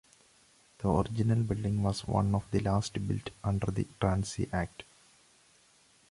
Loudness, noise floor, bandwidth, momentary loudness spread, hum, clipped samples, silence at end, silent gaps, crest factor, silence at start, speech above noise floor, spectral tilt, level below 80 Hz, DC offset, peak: -32 LUFS; -64 dBFS; 11.5 kHz; 6 LU; none; under 0.1%; 1.3 s; none; 18 dB; 0.8 s; 34 dB; -7 dB/octave; -48 dBFS; under 0.1%; -14 dBFS